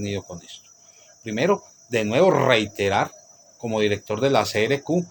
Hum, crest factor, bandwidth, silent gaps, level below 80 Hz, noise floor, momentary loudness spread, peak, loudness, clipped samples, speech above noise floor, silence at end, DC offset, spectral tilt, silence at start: none; 22 dB; 19 kHz; none; -62 dBFS; -52 dBFS; 19 LU; -2 dBFS; -22 LUFS; under 0.1%; 30 dB; 0 s; under 0.1%; -5 dB/octave; 0 s